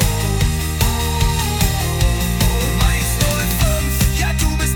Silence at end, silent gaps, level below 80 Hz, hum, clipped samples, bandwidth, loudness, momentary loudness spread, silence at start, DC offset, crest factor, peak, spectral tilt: 0 s; none; -20 dBFS; none; under 0.1%; 18 kHz; -17 LUFS; 1 LU; 0 s; under 0.1%; 14 dB; -4 dBFS; -4 dB/octave